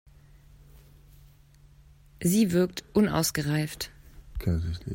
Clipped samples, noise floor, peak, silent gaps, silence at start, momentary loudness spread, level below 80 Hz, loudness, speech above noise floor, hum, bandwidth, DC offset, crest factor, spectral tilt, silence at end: under 0.1%; -56 dBFS; -10 dBFS; none; 2.2 s; 12 LU; -46 dBFS; -27 LUFS; 30 dB; none; 16.5 kHz; under 0.1%; 18 dB; -5.5 dB/octave; 0 s